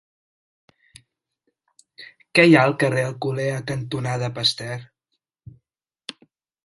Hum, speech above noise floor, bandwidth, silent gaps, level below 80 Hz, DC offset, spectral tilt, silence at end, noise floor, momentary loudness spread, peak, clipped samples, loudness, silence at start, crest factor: none; 59 dB; 11.5 kHz; none; -62 dBFS; under 0.1%; -5.5 dB/octave; 1.8 s; -79 dBFS; 24 LU; 0 dBFS; under 0.1%; -20 LUFS; 2 s; 24 dB